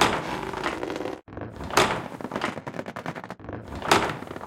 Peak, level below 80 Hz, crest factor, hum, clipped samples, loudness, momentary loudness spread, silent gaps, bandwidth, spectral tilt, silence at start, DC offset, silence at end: 0 dBFS; -50 dBFS; 28 dB; none; under 0.1%; -28 LUFS; 15 LU; none; 17 kHz; -3.5 dB/octave; 0 s; under 0.1%; 0 s